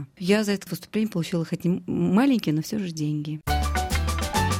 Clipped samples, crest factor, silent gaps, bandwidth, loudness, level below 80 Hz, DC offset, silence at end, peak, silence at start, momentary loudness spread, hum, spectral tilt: under 0.1%; 16 dB; none; 17 kHz; -25 LUFS; -34 dBFS; under 0.1%; 0 s; -8 dBFS; 0 s; 7 LU; none; -5.5 dB/octave